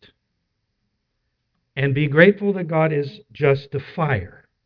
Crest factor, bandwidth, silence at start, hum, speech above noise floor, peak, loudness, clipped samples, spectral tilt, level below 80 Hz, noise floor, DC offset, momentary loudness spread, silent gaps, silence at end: 20 dB; 5.4 kHz; 1.75 s; none; 55 dB; 0 dBFS; -20 LUFS; under 0.1%; -9.5 dB/octave; -54 dBFS; -74 dBFS; under 0.1%; 16 LU; none; 0.4 s